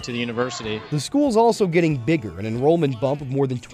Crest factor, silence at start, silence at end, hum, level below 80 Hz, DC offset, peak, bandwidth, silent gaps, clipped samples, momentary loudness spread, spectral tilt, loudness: 14 dB; 0 s; 0 s; none; -52 dBFS; under 0.1%; -6 dBFS; 14 kHz; none; under 0.1%; 8 LU; -6 dB/octave; -21 LUFS